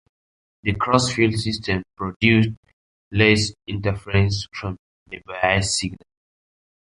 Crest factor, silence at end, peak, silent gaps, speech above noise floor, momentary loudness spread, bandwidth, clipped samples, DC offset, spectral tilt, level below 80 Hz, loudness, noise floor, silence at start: 20 dB; 1 s; -2 dBFS; 2.16-2.20 s, 2.57-2.63 s, 2.73-3.11 s, 4.79-5.06 s; over 69 dB; 15 LU; 11 kHz; under 0.1%; under 0.1%; -5 dB/octave; -42 dBFS; -21 LUFS; under -90 dBFS; 0.65 s